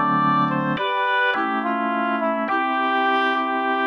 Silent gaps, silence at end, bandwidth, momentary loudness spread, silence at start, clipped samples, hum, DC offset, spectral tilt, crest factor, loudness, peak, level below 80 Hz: none; 0 s; 10 kHz; 3 LU; 0 s; under 0.1%; none; under 0.1%; -7 dB/octave; 12 dB; -21 LUFS; -10 dBFS; -68 dBFS